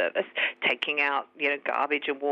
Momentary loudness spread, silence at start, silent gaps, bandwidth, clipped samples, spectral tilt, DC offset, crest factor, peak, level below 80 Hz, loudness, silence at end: 3 LU; 0 s; none; 8.2 kHz; under 0.1%; -4 dB/octave; under 0.1%; 16 dB; -12 dBFS; -86 dBFS; -26 LUFS; 0 s